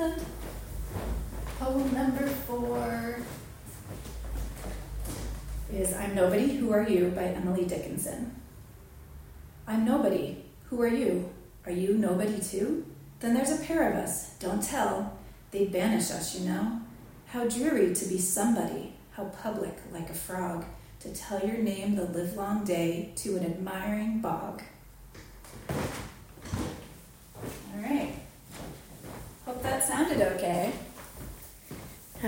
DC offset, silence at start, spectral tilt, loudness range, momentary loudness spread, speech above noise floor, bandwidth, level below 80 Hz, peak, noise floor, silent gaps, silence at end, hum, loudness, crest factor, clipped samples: under 0.1%; 0 s; -5 dB/octave; 8 LU; 19 LU; 21 dB; 17 kHz; -46 dBFS; -12 dBFS; -50 dBFS; none; 0 s; none; -31 LUFS; 18 dB; under 0.1%